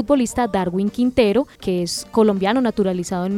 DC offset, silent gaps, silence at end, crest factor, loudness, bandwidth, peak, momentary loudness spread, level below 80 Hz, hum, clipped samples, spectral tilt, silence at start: under 0.1%; none; 0 s; 16 dB; -19 LUFS; 16 kHz; -2 dBFS; 6 LU; -46 dBFS; none; under 0.1%; -5.5 dB/octave; 0 s